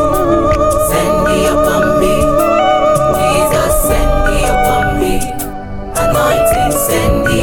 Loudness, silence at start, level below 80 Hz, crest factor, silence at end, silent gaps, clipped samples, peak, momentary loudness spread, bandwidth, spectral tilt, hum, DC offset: -12 LUFS; 0 s; -20 dBFS; 10 dB; 0 s; none; under 0.1%; 0 dBFS; 5 LU; 17.5 kHz; -4.5 dB/octave; none; under 0.1%